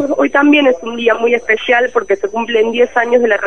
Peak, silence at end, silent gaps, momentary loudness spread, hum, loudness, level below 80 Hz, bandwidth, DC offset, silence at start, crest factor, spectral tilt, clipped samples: 0 dBFS; 0 s; none; 6 LU; none; -12 LUFS; -52 dBFS; 6.8 kHz; 1%; 0 s; 12 dB; -4 dB/octave; under 0.1%